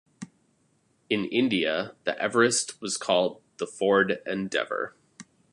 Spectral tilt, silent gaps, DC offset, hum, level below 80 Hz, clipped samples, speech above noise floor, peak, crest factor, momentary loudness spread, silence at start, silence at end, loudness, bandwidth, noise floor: -3 dB/octave; none; under 0.1%; none; -70 dBFS; under 0.1%; 42 dB; -6 dBFS; 22 dB; 14 LU; 0.2 s; 0.3 s; -26 LUFS; 11.5 kHz; -68 dBFS